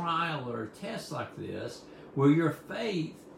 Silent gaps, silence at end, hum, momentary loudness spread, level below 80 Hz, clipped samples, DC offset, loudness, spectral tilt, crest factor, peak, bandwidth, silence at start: none; 0 s; none; 14 LU; -70 dBFS; under 0.1%; under 0.1%; -32 LUFS; -6.5 dB/octave; 18 dB; -14 dBFS; 15.5 kHz; 0 s